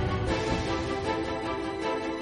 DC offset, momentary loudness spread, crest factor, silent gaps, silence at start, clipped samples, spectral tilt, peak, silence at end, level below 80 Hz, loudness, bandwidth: under 0.1%; 3 LU; 14 dB; none; 0 s; under 0.1%; -5.5 dB/octave; -16 dBFS; 0 s; -42 dBFS; -30 LUFS; 11 kHz